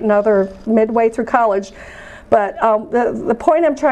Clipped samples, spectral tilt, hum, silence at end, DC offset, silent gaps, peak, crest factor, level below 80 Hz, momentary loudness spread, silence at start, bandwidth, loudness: under 0.1%; -7 dB/octave; none; 0 s; under 0.1%; none; 0 dBFS; 14 dB; -46 dBFS; 14 LU; 0 s; 9.4 kHz; -16 LUFS